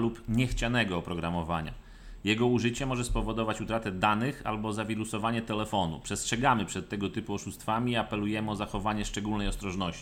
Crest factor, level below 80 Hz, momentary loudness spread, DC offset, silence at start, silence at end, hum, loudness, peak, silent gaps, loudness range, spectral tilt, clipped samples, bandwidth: 20 dB; -42 dBFS; 7 LU; under 0.1%; 0 s; 0 s; none; -31 LUFS; -10 dBFS; none; 1 LU; -5 dB/octave; under 0.1%; 16.5 kHz